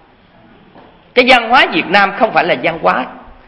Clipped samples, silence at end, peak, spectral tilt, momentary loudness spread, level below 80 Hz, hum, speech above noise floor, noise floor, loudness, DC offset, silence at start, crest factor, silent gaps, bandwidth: 0.3%; 0.15 s; 0 dBFS; -4.5 dB/octave; 8 LU; -46 dBFS; none; 34 dB; -45 dBFS; -11 LUFS; under 0.1%; 1.15 s; 14 dB; none; 11 kHz